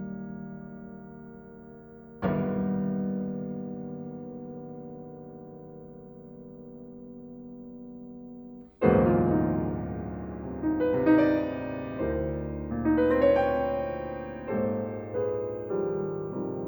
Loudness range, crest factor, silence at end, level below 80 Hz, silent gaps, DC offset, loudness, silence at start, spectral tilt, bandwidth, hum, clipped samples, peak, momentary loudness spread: 18 LU; 22 dB; 0 s; -50 dBFS; none; under 0.1%; -28 LUFS; 0 s; -10.5 dB/octave; over 20 kHz; none; under 0.1%; -6 dBFS; 23 LU